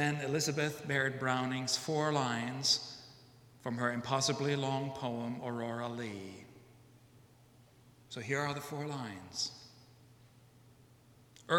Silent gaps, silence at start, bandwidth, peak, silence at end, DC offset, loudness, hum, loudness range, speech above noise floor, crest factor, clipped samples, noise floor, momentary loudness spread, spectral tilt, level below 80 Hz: none; 0 s; 17.5 kHz; -16 dBFS; 0 s; under 0.1%; -35 LUFS; none; 9 LU; 27 dB; 22 dB; under 0.1%; -62 dBFS; 15 LU; -4 dB/octave; -74 dBFS